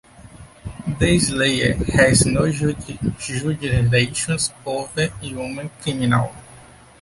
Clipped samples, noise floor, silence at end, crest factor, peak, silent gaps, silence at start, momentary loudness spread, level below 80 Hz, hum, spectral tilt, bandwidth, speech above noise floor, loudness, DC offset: under 0.1%; -45 dBFS; 0.4 s; 18 dB; -2 dBFS; none; 0.2 s; 13 LU; -36 dBFS; none; -4.5 dB/octave; 11.5 kHz; 25 dB; -20 LUFS; under 0.1%